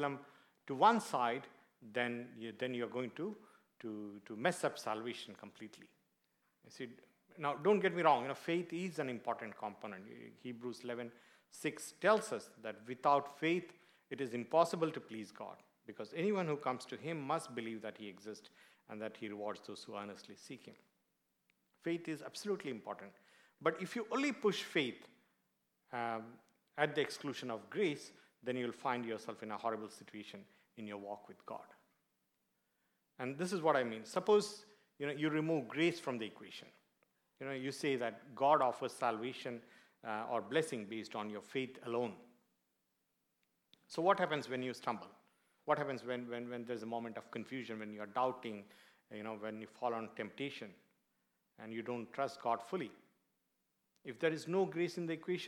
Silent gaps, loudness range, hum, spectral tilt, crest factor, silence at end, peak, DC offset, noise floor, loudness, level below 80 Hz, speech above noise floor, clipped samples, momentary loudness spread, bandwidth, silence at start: none; 9 LU; none; -5 dB/octave; 24 dB; 0 s; -16 dBFS; under 0.1%; -84 dBFS; -39 LUFS; under -90 dBFS; 45 dB; under 0.1%; 18 LU; 16.5 kHz; 0 s